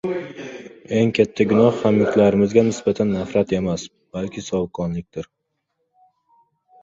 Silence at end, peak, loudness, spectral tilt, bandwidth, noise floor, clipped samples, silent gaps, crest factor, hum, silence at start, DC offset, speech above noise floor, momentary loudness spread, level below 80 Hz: 1.6 s; -2 dBFS; -20 LUFS; -6.5 dB/octave; 7.8 kHz; -74 dBFS; under 0.1%; none; 18 dB; none; 0.05 s; under 0.1%; 55 dB; 18 LU; -50 dBFS